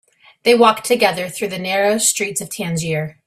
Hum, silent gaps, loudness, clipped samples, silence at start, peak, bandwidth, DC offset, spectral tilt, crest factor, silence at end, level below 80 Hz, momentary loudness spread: none; none; -17 LUFS; under 0.1%; 0.45 s; 0 dBFS; 16 kHz; under 0.1%; -3 dB/octave; 18 dB; 0.15 s; -58 dBFS; 11 LU